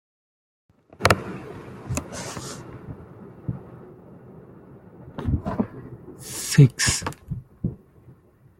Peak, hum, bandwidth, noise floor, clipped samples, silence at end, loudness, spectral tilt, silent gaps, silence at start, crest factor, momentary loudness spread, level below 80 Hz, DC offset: -2 dBFS; none; 16.5 kHz; -53 dBFS; under 0.1%; 0.45 s; -25 LUFS; -4.5 dB/octave; none; 1 s; 26 dB; 27 LU; -44 dBFS; under 0.1%